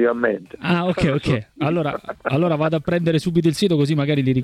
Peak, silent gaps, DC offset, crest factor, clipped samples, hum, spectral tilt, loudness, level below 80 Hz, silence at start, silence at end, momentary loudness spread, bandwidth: -6 dBFS; none; under 0.1%; 14 dB; under 0.1%; none; -7 dB/octave; -20 LUFS; -46 dBFS; 0 s; 0 s; 5 LU; 13.5 kHz